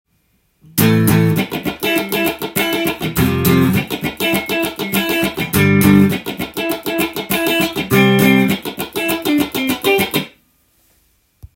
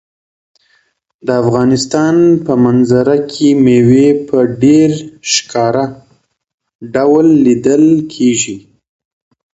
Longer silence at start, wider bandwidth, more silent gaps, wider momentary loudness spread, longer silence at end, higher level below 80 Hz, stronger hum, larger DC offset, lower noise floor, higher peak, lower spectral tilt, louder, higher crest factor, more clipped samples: second, 0.75 s vs 1.25 s; first, 17 kHz vs 8.2 kHz; second, none vs 6.54-6.58 s, 6.75-6.79 s; about the same, 9 LU vs 8 LU; second, 0.1 s vs 0.95 s; first, -44 dBFS vs -50 dBFS; neither; neither; about the same, -61 dBFS vs -58 dBFS; about the same, 0 dBFS vs 0 dBFS; about the same, -5 dB/octave vs -5.5 dB/octave; second, -15 LUFS vs -11 LUFS; about the same, 16 dB vs 12 dB; neither